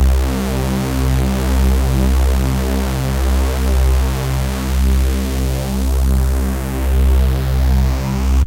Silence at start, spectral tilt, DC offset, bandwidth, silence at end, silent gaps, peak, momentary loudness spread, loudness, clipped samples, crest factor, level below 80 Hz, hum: 0 s; -6 dB/octave; under 0.1%; 16.5 kHz; 0 s; none; -4 dBFS; 4 LU; -17 LUFS; under 0.1%; 10 dB; -16 dBFS; none